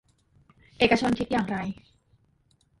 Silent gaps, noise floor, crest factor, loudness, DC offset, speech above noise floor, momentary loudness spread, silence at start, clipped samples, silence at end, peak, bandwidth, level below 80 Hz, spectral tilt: none; -66 dBFS; 22 dB; -26 LUFS; under 0.1%; 41 dB; 14 LU; 0.8 s; under 0.1%; 1.05 s; -8 dBFS; 11.5 kHz; -54 dBFS; -5.5 dB/octave